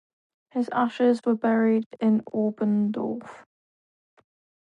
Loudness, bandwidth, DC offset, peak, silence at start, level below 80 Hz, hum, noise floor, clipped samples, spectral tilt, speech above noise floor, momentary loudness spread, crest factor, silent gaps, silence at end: -25 LUFS; 7.4 kHz; under 0.1%; -10 dBFS; 0.55 s; -76 dBFS; none; under -90 dBFS; under 0.1%; -8 dB/octave; over 66 dB; 9 LU; 16 dB; 1.86-1.91 s; 1.3 s